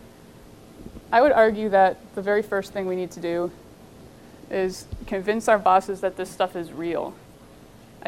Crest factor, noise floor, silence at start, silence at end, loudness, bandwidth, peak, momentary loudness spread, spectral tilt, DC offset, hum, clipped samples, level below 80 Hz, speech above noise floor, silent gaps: 18 dB; -48 dBFS; 0.05 s; 0.95 s; -23 LUFS; 16 kHz; -6 dBFS; 13 LU; -5 dB/octave; under 0.1%; none; under 0.1%; -52 dBFS; 25 dB; none